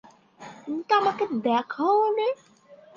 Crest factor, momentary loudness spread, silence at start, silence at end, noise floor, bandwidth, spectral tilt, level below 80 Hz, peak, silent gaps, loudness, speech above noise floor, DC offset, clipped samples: 18 dB; 15 LU; 0.4 s; 0.2 s; -47 dBFS; 7.2 kHz; -5.5 dB/octave; -76 dBFS; -8 dBFS; none; -24 LUFS; 23 dB; under 0.1%; under 0.1%